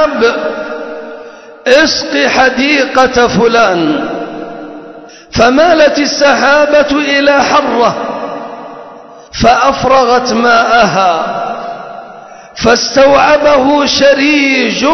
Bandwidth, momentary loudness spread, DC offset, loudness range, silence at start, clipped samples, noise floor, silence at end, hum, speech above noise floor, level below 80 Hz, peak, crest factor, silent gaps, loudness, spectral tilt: 8 kHz; 18 LU; 0.4%; 2 LU; 0 s; 0.2%; -32 dBFS; 0 s; none; 24 dB; -38 dBFS; 0 dBFS; 10 dB; none; -9 LUFS; -3.5 dB/octave